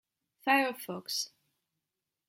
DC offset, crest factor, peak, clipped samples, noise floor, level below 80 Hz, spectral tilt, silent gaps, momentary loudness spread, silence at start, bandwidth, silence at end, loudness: under 0.1%; 24 dB; -12 dBFS; under 0.1%; -88 dBFS; -88 dBFS; -2 dB/octave; none; 13 LU; 0.45 s; 16.5 kHz; 1 s; -32 LUFS